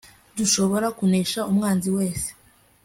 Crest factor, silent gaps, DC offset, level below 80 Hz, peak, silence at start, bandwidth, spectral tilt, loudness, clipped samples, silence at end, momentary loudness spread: 16 dB; none; under 0.1%; -52 dBFS; -8 dBFS; 0.35 s; 16 kHz; -4.5 dB/octave; -22 LUFS; under 0.1%; 0.5 s; 9 LU